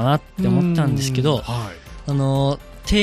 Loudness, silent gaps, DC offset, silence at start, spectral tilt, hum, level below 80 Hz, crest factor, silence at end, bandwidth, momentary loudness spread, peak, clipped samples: -20 LUFS; none; under 0.1%; 0 s; -6 dB/octave; none; -34 dBFS; 16 dB; 0 s; 14 kHz; 10 LU; -4 dBFS; under 0.1%